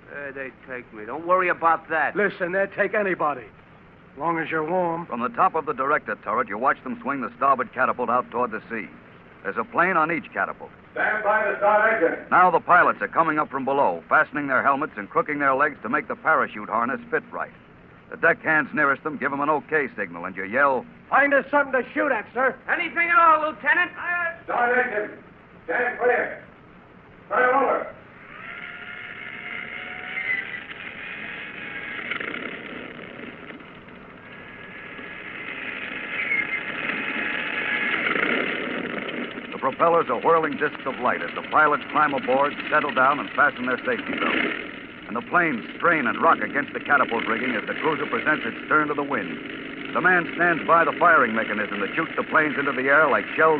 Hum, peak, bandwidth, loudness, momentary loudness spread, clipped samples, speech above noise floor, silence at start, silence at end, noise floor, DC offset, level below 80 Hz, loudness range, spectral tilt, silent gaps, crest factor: none; -6 dBFS; 4.8 kHz; -22 LUFS; 16 LU; under 0.1%; 27 dB; 0.1 s; 0 s; -49 dBFS; under 0.1%; -62 dBFS; 10 LU; -8.5 dB/octave; none; 18 dB